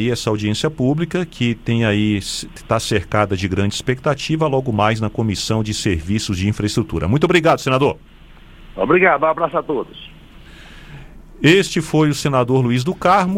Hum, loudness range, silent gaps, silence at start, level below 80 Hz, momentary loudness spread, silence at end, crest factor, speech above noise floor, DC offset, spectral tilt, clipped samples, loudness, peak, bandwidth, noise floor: none; 2 LU; none; 0 s; -40 dBFS; 8 LU; 0 s; 18 dB; 25 dB; under 0.1%; -5.5 dB/octave; under 0.1%; -18 LUFS; 0 dBFS; 16 kHz; -42 dBFS